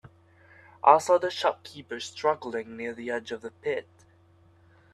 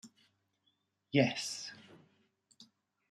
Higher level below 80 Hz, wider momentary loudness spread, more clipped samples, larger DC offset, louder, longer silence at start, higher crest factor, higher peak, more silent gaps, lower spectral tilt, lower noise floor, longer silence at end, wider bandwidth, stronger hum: first, -74 dBFS vs -84 dBFS; about the same, 16 LU vs 17 LU; neither; neither; first, -27 LUFS vs -34 LUFS; first, 0.85 s vs 0.05 s; about the same, 26 dB vs 26 dB; first, -4 dBFS vs -14 dBFS; neither; about the same, -3.5 dB/octave vs -4.5 dB/octave; second, -59 dBFS vs -79 dBFS; first, 1.1 s vs 0.5 s; about the same, 13 kHz vs 13.5 kHz; neither